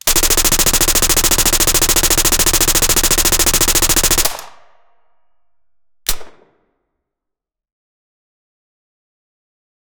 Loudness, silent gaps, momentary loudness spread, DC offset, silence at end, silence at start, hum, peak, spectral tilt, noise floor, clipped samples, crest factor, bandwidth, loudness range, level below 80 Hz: -11 LUFS; none; 11 LU; under 0.1%; 3.7 s; 0.05 s; none; 0 dBFS; -1 dB/octave; -82 dBFS; under 0.1%; 16 dB; over 20 kHz; 20 LU; -24 dBFS